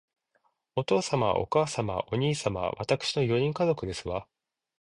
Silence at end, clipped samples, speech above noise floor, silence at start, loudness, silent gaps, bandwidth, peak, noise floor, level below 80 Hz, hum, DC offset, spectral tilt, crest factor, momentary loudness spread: 0.6 s; under 0.1%; 45 dB; 0.75 s; -29 LUFS; none; 11 kHz; -10 dBFS; -73 dBFS; -54 dBFS; none; under 0.1%; -5.5 dB/octave; 18 dB; 8 LU